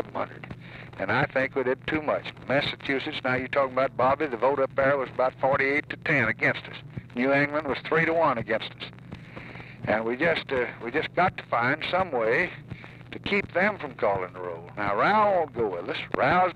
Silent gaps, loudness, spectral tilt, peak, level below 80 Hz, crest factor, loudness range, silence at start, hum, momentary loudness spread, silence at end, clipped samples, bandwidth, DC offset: none; -26 LUFS; -7 dB/octave; -8 dBFS; -56 dBFS; 18 dB; 3 LU; 0 s; none; 16 LU; 0 s; under 0.1%; 9.4 kHz; under 0.1%